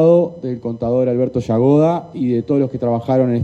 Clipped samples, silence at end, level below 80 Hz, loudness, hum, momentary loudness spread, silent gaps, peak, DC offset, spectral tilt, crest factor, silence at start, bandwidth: under 0.1%; 0 s; -50 dBFS; -17 LUFS; none; 9 LU; none; -2 dBFS; under 0.1%; -10 dB/octave; 14 dB; 0 s; 8 kHz